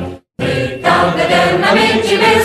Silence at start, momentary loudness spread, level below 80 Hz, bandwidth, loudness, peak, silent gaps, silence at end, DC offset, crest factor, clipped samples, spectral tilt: 0 s; 8 LU; -42 dBFS; 14 kHz; -12 LUFS; 0 dBFS; none; 0 s; under 0.1%; 12 dB; under 0.1%; -4.5 dB/octave